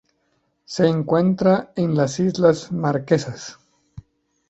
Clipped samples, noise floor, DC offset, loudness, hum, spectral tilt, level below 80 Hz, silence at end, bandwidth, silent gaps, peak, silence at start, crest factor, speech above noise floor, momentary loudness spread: under 0.1%; -68 dBFS; under 0.1%; -20 LUFS; none; -6.5 dB/octave; -56 dBFS; 0.5 s; 8.2 kHz; none; -2 dBFS; 0.7 s; 18 dB; 49 dB; 14 LU